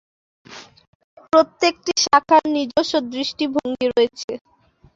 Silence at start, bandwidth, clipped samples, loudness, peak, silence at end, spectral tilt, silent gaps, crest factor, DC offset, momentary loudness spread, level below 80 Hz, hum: 0.5 s; 7.8 kHz; under 0.1%; -19 LUFS; -2 dBFS; 0.6 s; -2.5 dB/octave; 0.88-1.17 s, 4.24-4.28 s; 18 dB; under 0.1%; 17 LU; -60 dBFS; none